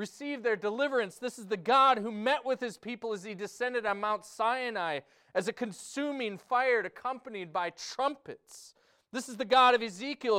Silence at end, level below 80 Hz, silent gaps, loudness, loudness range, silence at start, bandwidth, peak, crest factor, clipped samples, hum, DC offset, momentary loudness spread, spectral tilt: 0 s; -76 dBFS; none; -31 LUFS; 4 LU; 0 s; 15.5 kHz; -14 dBFS; 18 dB; under 0.1%; none; under 0.1%; 16 LU; -3.5 dB/octave